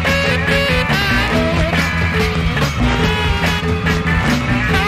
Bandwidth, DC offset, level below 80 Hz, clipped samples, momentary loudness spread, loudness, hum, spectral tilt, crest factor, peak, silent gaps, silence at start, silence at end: 15.5 kHz; under 0.1%; -24 dBFS; under 0.1%; 2 LU; -15 LUFS; none; -5.5 dB/octave; 12 dB; -2 dBFS; none; 0 s; 0 s